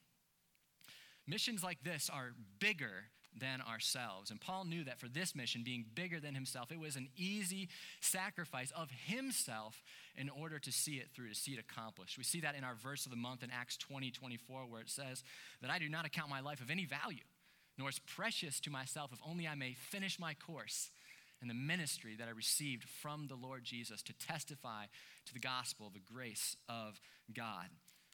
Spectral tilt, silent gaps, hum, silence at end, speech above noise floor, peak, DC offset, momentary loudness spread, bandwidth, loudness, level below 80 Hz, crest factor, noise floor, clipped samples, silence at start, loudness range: -2.5 dB/octave; none; none; 0.15 s; 33 dB; -22 dBFS; under 0.1%; 12 LU; 19 kHz; -44 LUFS; -90 dBFS; 24 dB; -78 dBFS; under 0.1%; 0.85 s; 4 LU